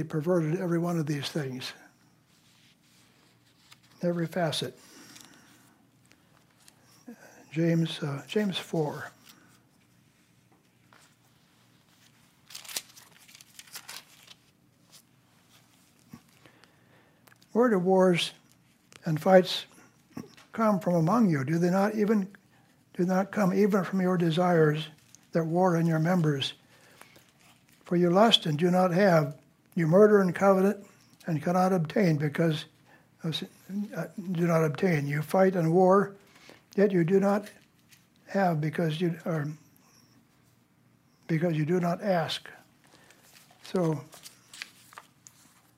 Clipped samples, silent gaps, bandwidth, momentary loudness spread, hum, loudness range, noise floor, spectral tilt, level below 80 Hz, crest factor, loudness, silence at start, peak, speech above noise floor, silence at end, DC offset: under 0.1%; none; 16 kHz; 20 LU; none; 14 LU; -64 dBFS; -6.5 dB/octave; -76 dBFS; 24 dB; -27 LUFS; 0 s; -6 dBFS; 39 dB; 1.15 s; under 0.1%